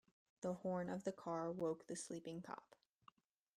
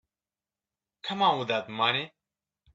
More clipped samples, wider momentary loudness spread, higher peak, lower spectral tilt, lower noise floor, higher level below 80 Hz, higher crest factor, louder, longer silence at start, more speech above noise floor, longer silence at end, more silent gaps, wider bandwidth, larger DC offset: neither; second, 8 LU vs 13 LU; second, -30 dBFS vs -10 dBFS; about the same, -6 dB/octave vs -5 dB/octave; second, -73 dBFS vs under -90 dBFS; second, -82 dBFS vs -72 dBFS; about the same, 18 dB vs 22 dB; second, -47 LUFS vs -27 LUFS; second, 0.4 s vs 1.05 s; second, 27 dB vs over 63 dB; first, 0.9 s vs 0.65 s; neither; first, 13 kHz vs 7.8 kHz; neither